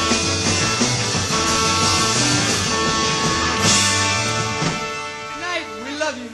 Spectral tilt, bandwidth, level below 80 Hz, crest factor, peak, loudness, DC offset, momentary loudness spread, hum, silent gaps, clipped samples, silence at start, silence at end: -2.5 dB/octave; 16 kHz; -40 dBFS; 16 dB; -4 dBFS; -18 LUFS; under 0.1%; 10 LU; none; none; under 0.1%; 0 s; 0 s